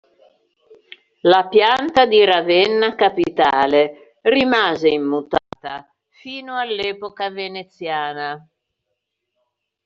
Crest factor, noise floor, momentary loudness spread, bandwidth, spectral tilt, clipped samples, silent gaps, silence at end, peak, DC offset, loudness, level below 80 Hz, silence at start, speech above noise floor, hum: 16 dB; -77 dBFS; 16 LU; 7.4 kHz; -1 dB/octave; under 0.1%; none; 1.45 s; -2 dBFS; under 0.1%; -17 LUFS; -58 dBFS; 1.25 s; 60 dB; none